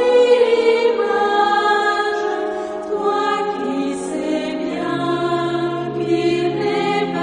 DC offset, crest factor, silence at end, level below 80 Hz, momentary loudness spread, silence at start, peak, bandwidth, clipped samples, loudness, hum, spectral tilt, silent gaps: under 0.1%; 14 dB; 0 s; -58 dBFS; 9 LU; 0 s; -4 dBFS; 10.5 kHz; under 0.1%; -18 LUFS; none; -5 dB/octave; none